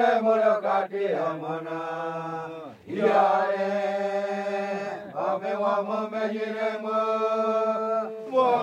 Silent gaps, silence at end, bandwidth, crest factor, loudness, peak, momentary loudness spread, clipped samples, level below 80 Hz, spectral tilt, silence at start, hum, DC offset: none; 0 s; 9.6 kHz; 16 dB; -26 LUFS; -10 dBFS; 11 LU; under 0.1%; -80 dBFS; -6 dB/octave; 0 s; none; under 0.1%